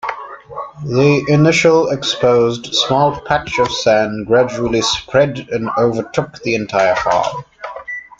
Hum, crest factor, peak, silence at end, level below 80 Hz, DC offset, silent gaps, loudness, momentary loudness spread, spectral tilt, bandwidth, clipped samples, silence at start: none; 14 dB; 0 dBFS; 0.15 s; -46 dBFS; under 0.1%; none; -15 LUFS; 15 LU; -5 dB/octave; 9.2 kHz; under 0.1%; 0.05 s